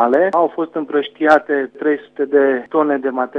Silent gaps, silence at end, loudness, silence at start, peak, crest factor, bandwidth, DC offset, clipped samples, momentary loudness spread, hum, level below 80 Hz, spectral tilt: none; 0 s; -17 LUFS; 0 s; 0 dBFS; 16 dB; 7.6 kHz; under 0.1%; under 0.1%; 7 LU; none; -68 dBFS; -6.5 dB/octave